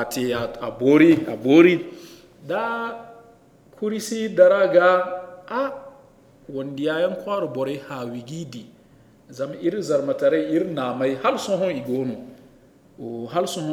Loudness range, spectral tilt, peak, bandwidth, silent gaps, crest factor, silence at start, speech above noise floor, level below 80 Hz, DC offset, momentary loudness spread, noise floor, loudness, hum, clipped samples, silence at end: 8 LU; -5.5 dB/octave; -2 dBFS; 16 kHz; none; 20 dB; 0 s; 32 dB; -60 dBFS; under 0.1%; 19 LU; -53 dBFS; -21 LUFS; none; under 0.1%; 0 s